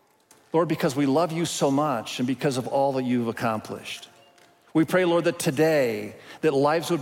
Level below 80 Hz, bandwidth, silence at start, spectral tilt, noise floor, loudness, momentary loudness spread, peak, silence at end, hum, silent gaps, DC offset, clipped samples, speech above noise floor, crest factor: -68 dBFS; 16.5 kHz; 0.55 s; -5.5 dB/octave; -58 dBFS; -24 LUFS; 10 LU; -10 dBFS; 0 s; none; none; under 0.1%; under 0.1%; 35 dB; 16 dB